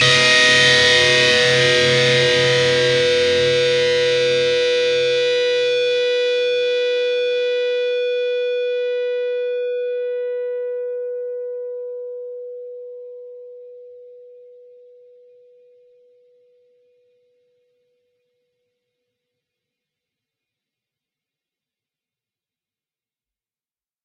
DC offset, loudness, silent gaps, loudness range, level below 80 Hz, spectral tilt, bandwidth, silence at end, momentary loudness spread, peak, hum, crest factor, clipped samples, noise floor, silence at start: under 0.1%; -16 LUFS; none; 19 LU; -60 dBFS; -2.5 dB/octave; 11 kHz; 9.75 s; 19 LU; -2 dBFS; none; 20 dB; under 0.1%; under -90 dBFS; 0 s